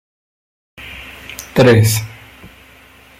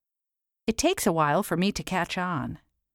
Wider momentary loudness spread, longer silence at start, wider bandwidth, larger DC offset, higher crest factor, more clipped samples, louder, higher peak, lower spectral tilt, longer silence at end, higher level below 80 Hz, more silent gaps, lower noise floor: first, 23 LU vs 10 LU; first, 0.8 s vs 0.65 s; about the same, 16 kHz vs 17.5 kHz; neither; about the same, 18 dB vs 20 dB; neither; first, -13 LUFS vs -26 LUFS; first, 0 dBFS vs -8 dBFS; about the same, -5.5 dB/octave vs -4.5 dB/octave; first, 1.1 s vs 0.4 s; about the same, -46 dBFS vs -50 dBFS; neither; second, -44 dBFS vs -87 dBFS